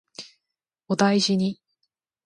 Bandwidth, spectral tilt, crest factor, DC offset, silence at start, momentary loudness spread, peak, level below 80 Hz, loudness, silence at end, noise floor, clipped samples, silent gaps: 11.5 kHz; -5 dB/octave; 22 dB; under 0.1%; 0.2 s; 22 LU; -4 dBFS; -70 dBFS; -22 LUFS; 0.7 s; -85 dBFS; under 0.1%; none